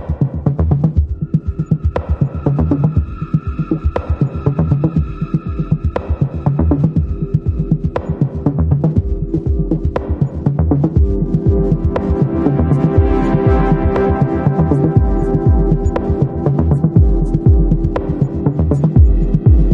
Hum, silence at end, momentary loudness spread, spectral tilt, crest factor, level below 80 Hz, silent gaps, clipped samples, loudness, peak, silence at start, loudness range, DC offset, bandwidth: none; 0 s; 6 LU; -11 dB/octave; 14 dB; -20 dBFS; none; under 0.1%; -15 LUFS; 0 dBFS; 0 s; 4 LU; under 0.1%; 4.5 kHz